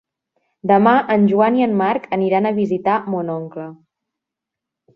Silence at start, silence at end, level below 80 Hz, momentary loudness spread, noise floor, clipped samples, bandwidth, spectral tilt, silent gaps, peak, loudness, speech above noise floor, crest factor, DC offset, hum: 0.65 s; 1.2 s; -64 dBFS; 13 LU; -84 dBFS; under 0.1%; 5.4 kHz; -9 dB/octave; none; -2 dBFS; -17 LUFS; 67 dB; 16 dB; under 0.1%; none